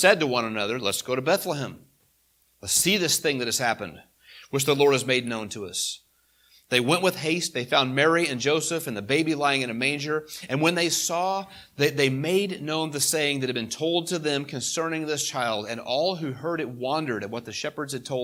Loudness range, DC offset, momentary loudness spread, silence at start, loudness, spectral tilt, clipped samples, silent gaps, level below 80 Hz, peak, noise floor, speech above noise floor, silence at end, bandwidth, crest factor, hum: 3 LU; under 0.1%; 10 LU; 0 s; -25 LUFS; -3 dB/octave; under 0.1%; none; -68 dBFS; -4 dBFS; -66 dBFS; 40 dB; 0 s; 19 kHz; 22 dB; none